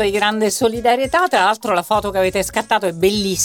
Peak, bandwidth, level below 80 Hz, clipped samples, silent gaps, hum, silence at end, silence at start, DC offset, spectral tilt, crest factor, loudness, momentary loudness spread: -2 dBFS; 19 kHz; -42 dBFS; under 0.1%; none; none; 0 s; 0 s; under 0.1%; -3 dB/octave; 14 dB; -17 LUFS; 3 LU